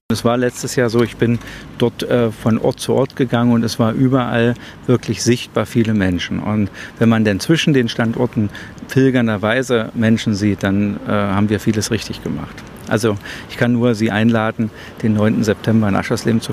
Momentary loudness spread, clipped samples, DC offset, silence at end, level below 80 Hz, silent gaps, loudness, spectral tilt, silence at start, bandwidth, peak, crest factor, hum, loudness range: 8 LU; under 0.1%; under 0.1%; 0 s; -46 dBFS; none; -17 LUFS; -6 dB/octave; 0.1 s; 15 kHz; 0 dBFS; 16 dB; none; 2 LU